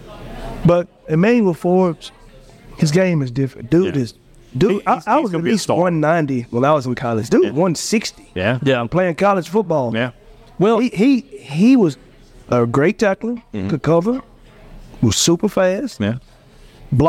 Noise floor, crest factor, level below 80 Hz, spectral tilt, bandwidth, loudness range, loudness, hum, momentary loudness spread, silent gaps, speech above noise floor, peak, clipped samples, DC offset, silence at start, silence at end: -44 dBFS; 14 dB; -44 dBFS; -6 dB/octave; 16 kHz; 2 LU; -17 LUFS; none; 9 LU; none; 28 dB; -4 dBFS; under 0.1%; under 0.1%; 0 s; 0 s